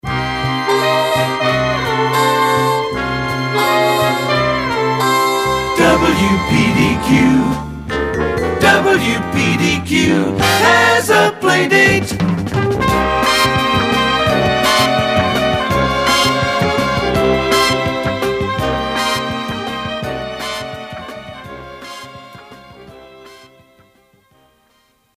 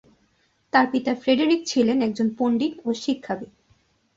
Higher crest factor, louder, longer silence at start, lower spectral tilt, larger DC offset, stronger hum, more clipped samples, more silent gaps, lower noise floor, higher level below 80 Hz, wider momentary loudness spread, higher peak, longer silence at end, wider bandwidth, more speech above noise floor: about the same, 16 dB vs 20 dB; first, -14 LUFS vs -23 LUFS; second, 0.05 s vs 0.75 s; about the same, -4.5 dB/octave vs -4.5 dB/octave; neither; neither; neither; neither; second, -57 dBFS vs -66 dBFS; first, -36 dBFS vs -64 dBFS; about the same, 11 LU vs 9 LU; first, 0 dBFS vs -4 dBFS; first, 1.8 s vs 0.7 s; first, 16 kHz vs 7.8 kHz; about the same, 45 dB vs 44 dB